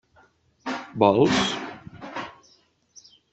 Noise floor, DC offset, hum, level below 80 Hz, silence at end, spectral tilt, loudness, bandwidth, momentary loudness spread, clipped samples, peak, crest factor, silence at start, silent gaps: -61 dBFS; under 0.1%; none; -58 dBFS; 1 s; -5 dB/octave; -23 LUFS; 8.4 kHz; 20 LU; under 0.1%; -4 dBFS; 22 dB; 0.65 s; none